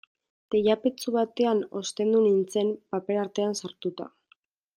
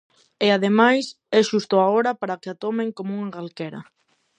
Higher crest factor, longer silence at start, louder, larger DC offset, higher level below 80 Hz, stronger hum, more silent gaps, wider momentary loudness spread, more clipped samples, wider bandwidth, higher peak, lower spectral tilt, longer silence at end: about the same, 16 dB vs 20 dB; about the same, 0.5 s vs 0.4 s; second, -27 LUFS vs -21 LUFS; neither; about the same, -72 dBFS vs -74 dBFS; neither; neither; second, 12 LU vs 15 LU; neither; first, 16 kHz vs 9.6 kHz; second, -10 dBFS vs -2 dBFS; about the same, -5 dB/octave vs -5 dB/octave; first, 0.7 s vs 0.55 s